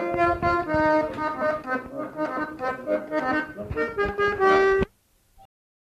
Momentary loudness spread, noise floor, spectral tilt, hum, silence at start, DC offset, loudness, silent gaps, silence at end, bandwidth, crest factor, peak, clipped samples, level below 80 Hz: 11 LU; -62 dBFS; -6.5 dB/octave; none; 0 s; under 0.1%; -24 LUFS; none; 0.55 s; 13 kHz; 18 dB; -8 dBFS; under 0.1%; -46 dBFS